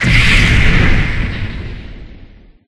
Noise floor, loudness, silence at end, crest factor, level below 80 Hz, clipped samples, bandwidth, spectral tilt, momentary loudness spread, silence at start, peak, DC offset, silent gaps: -39 dBFS; -12 LUFS; 0.45 s; 12 dB; -16 dBFS; under 0.1%; 11.5 kHz; -5 dB/octave; 20 LU; 0 s; 0 dBFS; under 0.1%; none